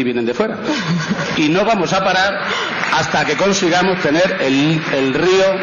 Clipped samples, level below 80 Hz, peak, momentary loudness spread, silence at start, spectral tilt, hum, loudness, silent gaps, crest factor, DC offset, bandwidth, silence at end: under 0.1%; -48 dBFS; -6 dBFS; 5 LU; 0 s; -4.5 dB/octave; none; -15 LUFS; none; 10 dB; under 0.1%; 7.4 kHz; 0 s